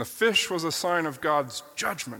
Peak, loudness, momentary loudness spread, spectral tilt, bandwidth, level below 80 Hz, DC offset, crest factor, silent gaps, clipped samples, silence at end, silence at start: -10 dBFS; -26 LUFS; 8 LU; -2.5 dB/octave; 17.5 kHz; -66 dBFS; under 0.1%; 16 dB; none; under 0.1%; 0 s; 0 s